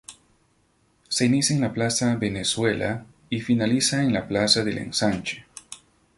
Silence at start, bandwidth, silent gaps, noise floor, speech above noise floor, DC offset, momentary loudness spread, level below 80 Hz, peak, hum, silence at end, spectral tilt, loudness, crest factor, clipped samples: 0.1 s; 11.5 kHz; none; -65 dBFS; 42 dB; under 0.1%; 15 LU; -54 dBFS; -4 dBFS; none; 0.4 s; -4 dB/octave; -23 LUFS; 20 dB; under 0.1%